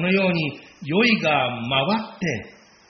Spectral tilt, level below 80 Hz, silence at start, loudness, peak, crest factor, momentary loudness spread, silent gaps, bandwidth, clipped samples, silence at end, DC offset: -3.5 dB/octave; -58 dBFS; 0 s; -21 LUFS; -6 dBFS; 16 dB; 11 LU; none; 6.4 kHz; under 0.1%; 0.4 s; under 0.1%